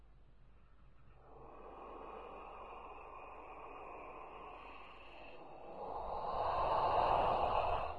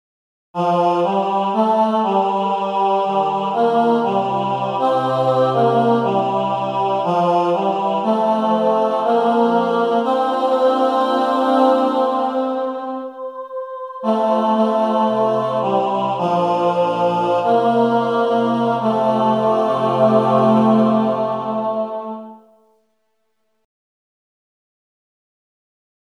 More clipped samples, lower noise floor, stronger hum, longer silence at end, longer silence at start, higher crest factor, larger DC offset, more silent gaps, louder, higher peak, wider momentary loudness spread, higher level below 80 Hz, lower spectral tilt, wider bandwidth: neither; second, -63 dBFS vs -71 dBFS; neither; second, 0 s vs 3.8 s; second, 0 s vs 0.55 s; about the same, 20 dB vs 16 dB; neither; neither; second, -38 LUFS vs -17 LUFS; second, -22 dBFS vs -2 dBFS; first, 21 LU vs 7 LU; first, -56 dBFS vs -74 dBFS; about the same, -6.5 dB/octave vs -7.5 dB/octave; about the same, 11 kHz vs 10 kHz